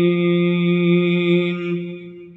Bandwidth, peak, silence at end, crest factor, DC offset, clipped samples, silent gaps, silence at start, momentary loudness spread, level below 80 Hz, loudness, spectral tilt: 4.1 kHz; -6 dBFS; 0.05 s; 12 dB; under 0.1%; under 0.1%; none; 0 s; 11 LU; -68 dBFS; -18 LUFS; -9.5 dB/octave